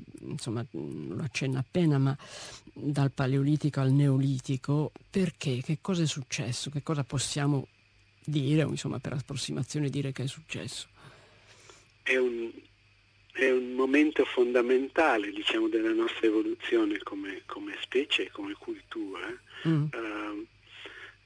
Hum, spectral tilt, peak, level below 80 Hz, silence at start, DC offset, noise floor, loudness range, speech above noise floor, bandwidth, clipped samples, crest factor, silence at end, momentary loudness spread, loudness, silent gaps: none; -6 dB/octave; -12 dBFS; -64 dBFS; 0 s; under 0.1%; -63 dBFS; 7 LU; 33 dB; 10.5 kHz; under 0.1%; 18 dB; 0.15 s; 14 LU; -30 LUFS; none